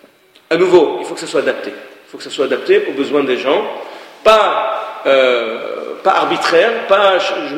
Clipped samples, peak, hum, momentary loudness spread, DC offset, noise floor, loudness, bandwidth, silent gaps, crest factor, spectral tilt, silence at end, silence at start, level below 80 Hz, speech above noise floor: under 0.1%; 0 dBFS; none; 14 LU; under 0.1%; -47 dBFS; -14 LUFS; 15 kHz; none; 14 dB; -4 dB/octave; 0 s; 0.5 s; -56 dBFS; 34 dB